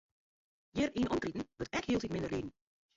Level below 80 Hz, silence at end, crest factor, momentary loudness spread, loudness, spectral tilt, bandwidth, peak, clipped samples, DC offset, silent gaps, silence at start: -58 dBFS; 0.45 s; 16 dB; 8 LU; -37 LUFS; -5.5 dB/octave; 7.8 kHz; -22 dBFS; under 0.1%; under 0.1%; none; 0.75 s